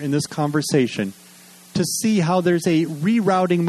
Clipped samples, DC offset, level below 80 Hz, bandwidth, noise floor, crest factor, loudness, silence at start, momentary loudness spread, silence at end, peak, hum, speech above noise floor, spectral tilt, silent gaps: under 0.1%; under 0.1%; -60 dBFS; 13.5 kHz; -46 dBFS; 14 dB; -20 LUFS; 0 s; 7 LU; 0 s; -6 dBFS; none; 27 dB; -5.5 dB/octave; none